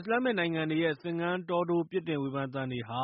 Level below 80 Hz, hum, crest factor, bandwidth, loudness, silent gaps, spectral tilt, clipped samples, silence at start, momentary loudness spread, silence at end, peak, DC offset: -70 dBFS; none; 14 dB; 5.4 kHz; -31 LUFS; none; -4.5 dB/octave; under 0.1%; 0 s; 5 LU; 0 s; -16 dBFS; under 0.1%